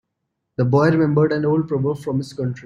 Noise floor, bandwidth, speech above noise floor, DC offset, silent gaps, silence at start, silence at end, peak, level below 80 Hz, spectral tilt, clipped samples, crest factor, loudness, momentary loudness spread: -77 dBFS; 11 kHz; 58 dB; under 0.1%; none; 0.6 s; 0 s; -4 dBFS; -56 dBFS; -8.5 dB/octave; under 0.1%; 16 dB; -19 LUFS; 9 LU